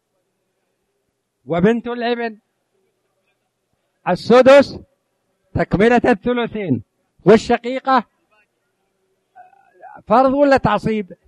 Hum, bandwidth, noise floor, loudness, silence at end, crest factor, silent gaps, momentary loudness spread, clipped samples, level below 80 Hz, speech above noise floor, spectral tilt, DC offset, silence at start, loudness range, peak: none; 11 kHz; -71 dBFS; -16 LUFS; 0.15 s; 18 dB; none; 12 LU; under 0.1%; -46 dBFS; 56 dB; -6.5 dB/octave; under 0.1%; 1.5 s; 8 LU; 0 dBFS